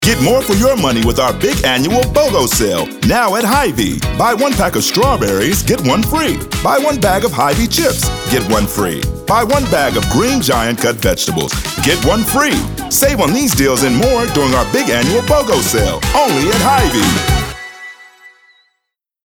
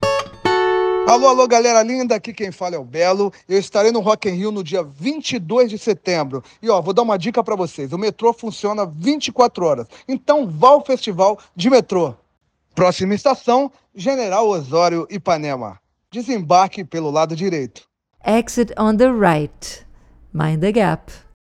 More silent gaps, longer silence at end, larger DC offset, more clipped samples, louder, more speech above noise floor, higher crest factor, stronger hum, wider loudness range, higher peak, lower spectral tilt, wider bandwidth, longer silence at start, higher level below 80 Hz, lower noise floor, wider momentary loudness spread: neither; first, 1 s vs 0.4 s; neither; neither; first, -13 LUFS vs -18 LUFS; first, 60 dB vs 28 dB; second, 12 dB vs 18 dB; neither; about the same, 2 LU vs 3 LU; about the same, 0 dBFS vs 0 dBFS; about the same, -4 dB/octave vs -5 dB/octave; first, over 20 kHz vs 12.5 kHz; about the same, 0 s vs 0 s; first, -26 dBFS vs -50 dBFS; first, -73 dBFS vs -45 dBFS; second, 4 LU vs 12 LU